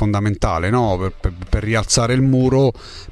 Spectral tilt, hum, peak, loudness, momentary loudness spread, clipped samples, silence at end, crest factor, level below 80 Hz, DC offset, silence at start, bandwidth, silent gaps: -5.5 dB/octave; none; -2 dBFS; -18 LUFS; 9 LU; under 0.1%; 0 s; 14 dB; -28 dBFS; under 0.1%; 0 s; 12 kHz; none